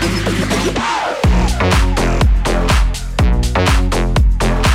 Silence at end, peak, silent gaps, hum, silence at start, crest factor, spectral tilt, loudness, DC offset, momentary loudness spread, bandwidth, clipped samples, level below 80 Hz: 0 s; -2 dBFS; none; none; 0 s; 12 dB; -5 dB/octave; -15 LUFS; under 0.1%; 3 LU; 15 kHz; under 0.1%; -16 dBFS